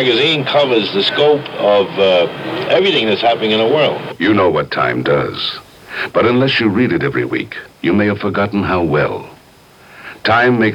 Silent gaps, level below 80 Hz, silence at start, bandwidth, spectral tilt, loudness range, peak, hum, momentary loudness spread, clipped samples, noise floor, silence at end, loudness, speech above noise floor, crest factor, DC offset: none; -48 dBFS; 0 s; 15 kHz; -6.5 dB/octave; 3 LU; 0 dBFS; none; 9 LU; under 0.1%; -44 dBFS; 0 s; -14 LUFS; 30 dB; 14 dB; under 0.1%